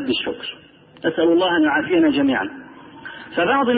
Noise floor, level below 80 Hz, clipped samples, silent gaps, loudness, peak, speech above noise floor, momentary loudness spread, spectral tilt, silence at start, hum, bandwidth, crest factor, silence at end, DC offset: -38 dBFS; -56 dBFS; under 0.1%; none; -19 LUFS; -8 dBFS; 20 dB; 19 LU; -10 dB/octave; 0 s; none; 4.8 kHz; 12 dB; 0 s; under 0.1%